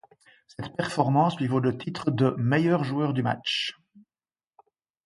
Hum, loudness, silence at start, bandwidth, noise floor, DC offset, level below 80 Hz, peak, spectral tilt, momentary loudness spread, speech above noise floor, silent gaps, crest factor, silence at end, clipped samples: none; -26 LUFS; 0.6 s; 11.5 kHz; under -90 dBFS; under 0.1%; -64 dBFS; -6 dBFS; -6.5 dB/octave; 10 LU; over 64 dB; none; 20 dB; 1.35 s; under 0.1%